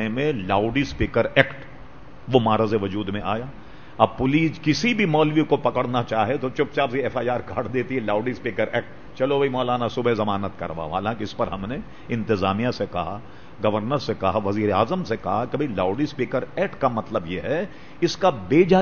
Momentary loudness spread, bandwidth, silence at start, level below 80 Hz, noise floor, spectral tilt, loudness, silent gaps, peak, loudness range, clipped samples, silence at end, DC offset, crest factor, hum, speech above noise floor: 9 LU; 7 kHz; 0 s; -46 dBFS; -44 dBFS; -6.5 dB/octave; -23 LUFS; none; 0 dBFS; 4 LU; under 0.1%; 0 s; 1%; 22 dB; none; 21 dB